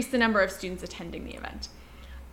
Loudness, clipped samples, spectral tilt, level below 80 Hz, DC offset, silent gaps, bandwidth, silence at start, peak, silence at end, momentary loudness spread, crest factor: -29 LUFS; under 0.1%; -4 dB/octave; -46 dBFS; under 0.1%; none; 16.5 kHz; 0 s; -10 dBFS; 0 s; 23 LU; 22 dB